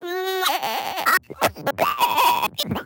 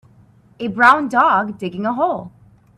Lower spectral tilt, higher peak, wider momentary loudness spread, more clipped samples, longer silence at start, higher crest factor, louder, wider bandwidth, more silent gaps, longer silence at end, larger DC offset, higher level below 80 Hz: second, -2.5 dB/octave vs -5.5 dB/octave; second, -4 dBFS vs 0 dBFS; second, 6 LU vs 15 LU; neither; second, 0 s vs 0.6 s; about the same, 18 dB vs 18 dB; second, -21 LUFS vs -16 LUFS; first, 17.5 kHz vs 12.5 kHz; neither; second, 0 s vs 0.5 s; neither; about the same, -56 dBFS vs -58 dBFS